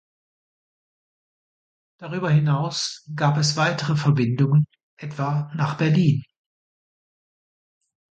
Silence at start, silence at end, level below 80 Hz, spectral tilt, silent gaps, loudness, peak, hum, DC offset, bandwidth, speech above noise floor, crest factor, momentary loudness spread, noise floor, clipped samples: 2 s; 1.95 s; -64 dBFS; -6 dB/octave; 4.83-4.97 s; -22 LUFS; -6 dBFS; none; under 0.1%; 9 kHz; over 69 dB; 18 dB; 10 LU; under -90 dBFS; under 0.1%